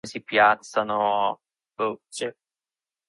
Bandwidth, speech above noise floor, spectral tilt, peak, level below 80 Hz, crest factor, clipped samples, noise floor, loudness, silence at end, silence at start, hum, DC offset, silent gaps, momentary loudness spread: 11.5 kHz; over 66 dB; -3 dB/octave; -6 dBFS; -68 dBFS; 20 dB; under 0.1%; under -90 dBFS; -24 LUFS; 0.75 s; 0.05 s; none; under 0.1%; none; 14 LU